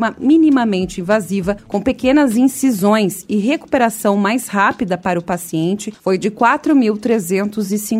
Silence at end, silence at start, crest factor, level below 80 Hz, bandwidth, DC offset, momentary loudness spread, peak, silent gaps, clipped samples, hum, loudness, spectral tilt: 0 s; 0 s; 14 dB; -48 dBFS; 16 kHz; under 0.1%; 8 LU; 0 dBFS; none; under 0.1%; none; -16 LUFS; -5.5 dB/octave